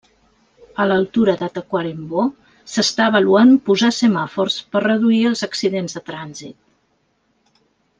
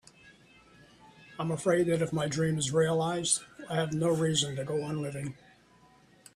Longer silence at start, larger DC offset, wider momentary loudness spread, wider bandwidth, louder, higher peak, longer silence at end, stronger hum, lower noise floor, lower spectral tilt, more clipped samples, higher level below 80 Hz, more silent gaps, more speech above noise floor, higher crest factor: first, 0.8 s vs 0.25 s; neither; first, 16 LU vs 10 LU; second, 9.6 kHz vs 13 kHz; first, -17 LUFS vs -30 LUFS; first, -2 dBFS vs -12 dBFS; first, 1.5 s vs 1.05 s; neither; about the same, -64 dBFS vs -61 dBFS; about the same, -4.5 dB/octave vs -4.5 dB/octave; neither; about the same, -60 dBFS vs -64 dBFS; neither; first, 48 dB vs 31 dB; about the same, 16 dB vs 18 dB